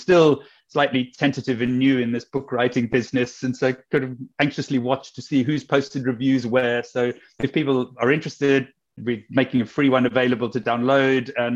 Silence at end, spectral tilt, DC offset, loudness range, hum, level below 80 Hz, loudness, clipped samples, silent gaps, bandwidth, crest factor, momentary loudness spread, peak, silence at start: 0 s; -6.5 dB/octave; under 0.1%; 2 LU; none; -60 dBFS; -22 LUFS; under 0.1%; none; 7.8 kHz; 16 dB; 8 LU; -4 dBFS; 0 s